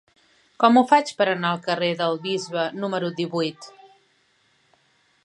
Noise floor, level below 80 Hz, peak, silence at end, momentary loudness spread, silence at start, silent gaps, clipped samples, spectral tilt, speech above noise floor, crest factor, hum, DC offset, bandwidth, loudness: -64 dBFS; -76 dBFS; -2 dBFS; 1.55 s; 10 LU; 0.6 s; none; under 0.1%; -5 dB/octave; 42 dB; 22 dB; none; under 0.1%; 11 kHz; -22 LUFS